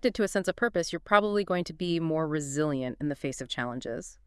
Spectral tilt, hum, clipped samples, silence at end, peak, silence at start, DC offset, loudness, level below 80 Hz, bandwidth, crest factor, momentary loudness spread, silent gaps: -5 dB/octave; none; under 0.1%; 0.15 s; -6 dBFS; 0.05 s; under 0.1%; -29 LUFS; -56 dBFS; 12 kHz; 24 dB; 9 LU; none